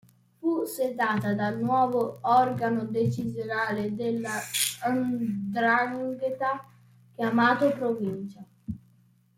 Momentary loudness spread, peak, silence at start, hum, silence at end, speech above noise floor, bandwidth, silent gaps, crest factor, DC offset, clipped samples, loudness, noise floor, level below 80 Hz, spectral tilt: 10 LU; -10 dBFS; 0.45 s; none; 0.6 s; 35 dB; 16.5 kHz; none; 18 dB; under 0.1%; under 0.1%; -27 LUFS; -62 dBFS; -64 dBFS; -4.5 dB/octave